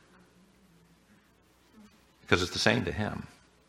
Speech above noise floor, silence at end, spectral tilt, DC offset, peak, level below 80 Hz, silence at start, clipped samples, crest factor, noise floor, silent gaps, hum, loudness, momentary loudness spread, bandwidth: 35 dB; 0.4 s; -4 dB/octave; under 0.1%; -4 dBFS; -56 dBFS; 1.8 s; under 0.1%; 30 dB; -64 dBFS; none; none; -29 LUFS; 16 LU; 16 kHz